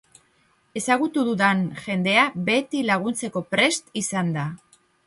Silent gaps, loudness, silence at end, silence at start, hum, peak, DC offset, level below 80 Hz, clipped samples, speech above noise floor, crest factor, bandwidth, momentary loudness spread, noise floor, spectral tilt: none; -22 LUFS; 0.5 s; 0.75 s; none; -4 dBFS; under 0.1%; -66 dBFS; under 0.1%; 41 dB; 18 dB; 11.5 kHz; 9 LU; -63 dBFS; -4 dB/octave